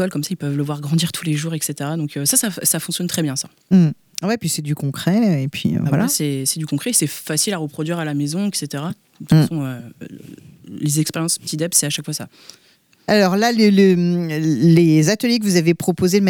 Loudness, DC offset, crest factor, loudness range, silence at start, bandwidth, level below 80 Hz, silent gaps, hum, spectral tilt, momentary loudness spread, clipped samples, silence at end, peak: -18 LUFS; under 0.1%; 16 dB; 6 LU; 0 s; 19.5 kHz; -58 dBFS; none; none; -4.5 dB/octave; 11 LU; under 0.1%; 0 s; -2 dBFS